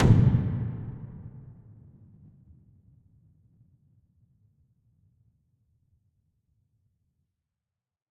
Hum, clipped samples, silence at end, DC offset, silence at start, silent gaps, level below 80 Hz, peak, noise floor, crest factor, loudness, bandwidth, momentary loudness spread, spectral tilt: none; under 0.1%; 6.7 s; under 0.1%; 0 s; none; -44 dBFS; -6 dBFS; -89 dBFS; 26 dB; -26 LUFS; 7.2 kHz; 29 LU; -9.5 dB/octave